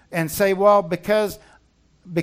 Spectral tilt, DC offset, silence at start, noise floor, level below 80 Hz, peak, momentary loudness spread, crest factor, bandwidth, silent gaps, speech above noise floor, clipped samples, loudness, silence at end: -5.5 dB/octave; under 0.1%; 0.1 s; -58 dBFS; -54 dBFS; -4 dBFS; 12 LU; 18 dB; 16 kHz; none; 39 dB; under 0.1%; -20 LUFS; 0 s